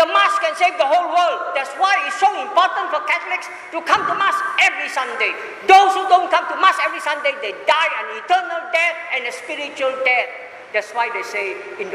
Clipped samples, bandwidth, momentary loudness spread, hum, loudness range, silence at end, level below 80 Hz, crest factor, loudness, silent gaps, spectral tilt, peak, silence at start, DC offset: under 0.1%; 14 kHz; 9 LU; none; 4 LU; 0 s; -70 dBFS; 18 dB; -18 LUFS; none; -1 dB/octave; 0 dBFS; 0 s; under 0.1%